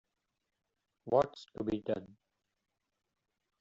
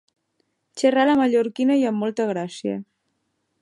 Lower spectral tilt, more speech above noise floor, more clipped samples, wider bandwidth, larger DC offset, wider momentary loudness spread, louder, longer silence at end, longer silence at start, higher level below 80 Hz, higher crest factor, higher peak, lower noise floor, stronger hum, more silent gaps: about the same, -6 dB/octave vs -5.5 dB/octave; about the same, 51 dB vs 53 dB; neither; second, 7.6 kHz vs 11.5 kHz; neither; second, 9 LU vs 12 LU; second, -35 LUFS vs -21 LUFS; first, 1.55 s vs 0.8 s; first, 1.05 s vs 0.75 s; about the same, -68 dBFS vs -70 dBFS; first, 24 dB vs 16 dB; second, -14 dBFS vs -6 dBFS; first, -86 dBFS vs -73 dBFS; neither; neither